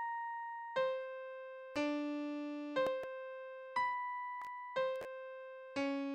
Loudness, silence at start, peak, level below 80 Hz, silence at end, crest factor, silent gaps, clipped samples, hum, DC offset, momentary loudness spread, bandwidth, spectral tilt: -41 LUFS; 0 s; -24 dBFS; -82 dBFS; 0 s; 16 dB; none; under 0.1%; none; under 0.1%; 11 LU; 10 kHz; -4.5 dB/octave